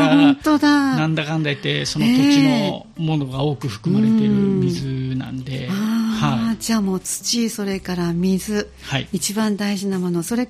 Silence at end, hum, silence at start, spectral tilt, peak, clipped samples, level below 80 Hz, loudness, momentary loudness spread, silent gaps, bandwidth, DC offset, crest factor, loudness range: 0 s; none; 0 s; -5 dB/octave; -2 dBFS; under 0.1%; -48 dBFS; -19 LUFS; 10 LU; none; 15.5 kHz; under 0.1%; 16 dB; 4 LU